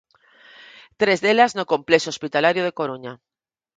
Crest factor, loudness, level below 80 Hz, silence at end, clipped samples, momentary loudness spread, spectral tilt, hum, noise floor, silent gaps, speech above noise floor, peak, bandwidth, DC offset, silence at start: 22 dB; -20 LUFS; -68 dBFS; 0.6 s; under 0.1%; 11 LU; -4 dB/octave; none; -52 dBFS; none; 32 dB; 0 dBFS; 9.4 kHz; under 0.1%; 1 s